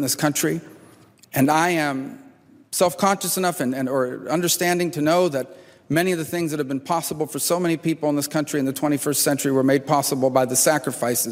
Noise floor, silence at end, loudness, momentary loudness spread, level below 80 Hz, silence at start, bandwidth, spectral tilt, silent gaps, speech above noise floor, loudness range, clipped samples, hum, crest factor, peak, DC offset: -50 dBFS; 0 s; -21 LUFS; 6 LU; -64 dBFS; 0 s; 16 kHz; -4 dB/octave; none; 29 dB; 3 LU; under 0.1%; none; 18 dB; -4 dBFS; under 0.1%